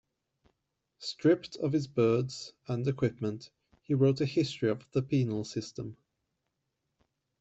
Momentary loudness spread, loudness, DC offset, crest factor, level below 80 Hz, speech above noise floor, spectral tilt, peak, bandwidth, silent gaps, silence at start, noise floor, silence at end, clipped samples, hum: 14 LU; -31 LUFS; under 0.1%; 18 dB; -68 dBFS; 53 dB; -7 dB/octave; -14 dBFS; 8.2 kHz; none; 1 s; -83 dBFS; 1.5 s; under 0.1%; none